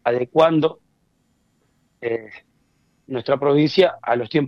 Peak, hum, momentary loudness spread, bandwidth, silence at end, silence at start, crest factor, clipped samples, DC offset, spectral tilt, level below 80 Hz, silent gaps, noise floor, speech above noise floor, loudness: -2 dBFS; none; 13 LU; 7.4 kHz; 0 s; 0.05 s; 18 dB; under 0.1%; under 0.1%; -7.5 dB/octave; -64 dBFS; none; -65 dBFS; 46 dB; -20 LUFS